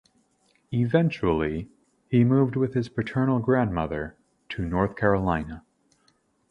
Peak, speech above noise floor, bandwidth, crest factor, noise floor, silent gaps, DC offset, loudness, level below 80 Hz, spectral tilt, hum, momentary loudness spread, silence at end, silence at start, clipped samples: -6 dBFS; 43 dB; 7 kHz; 20 dB; -67 dBFS; none; under 0.1%; -25 LUFS; -46 dBFS; -9 dB/octave; none; 14 LU; 0.9 s; 0.7 s; under 0.1%